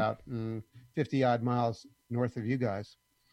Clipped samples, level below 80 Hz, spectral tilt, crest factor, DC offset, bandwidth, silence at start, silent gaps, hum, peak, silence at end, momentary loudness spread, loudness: under 0.1%; -66 dBFS; -8 dB/octave; 18 dB; under 0.1%; 9 kHz; 0 s; none; none; -14 dBFS; 0.45 s; 13 LU; -33 LUFS